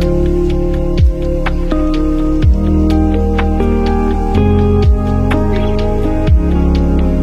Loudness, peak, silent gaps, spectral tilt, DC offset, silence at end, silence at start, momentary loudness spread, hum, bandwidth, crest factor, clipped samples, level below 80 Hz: -14 LUFS; 0 dBFS; none; -8.5 dB/octave; under 0.1%; 0 s; 0 s; 4 LU; none; 7.4 kHz; 12 dB; under 0.1%; -14 dBFS